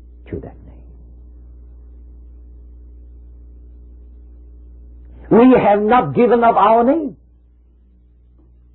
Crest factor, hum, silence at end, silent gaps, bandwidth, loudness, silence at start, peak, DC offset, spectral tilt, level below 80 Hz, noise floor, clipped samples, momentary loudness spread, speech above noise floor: 18 dB; 60 Hz at -40 dBFS; 1.65 s; none; 4.2 kHz; -13 LUFS; 0.3 s; -2 dBFS; under 0.1%; -12 dB/octave; -40 dBFS; -49 dBFS; under 0.1%; 21 LU; 37 dB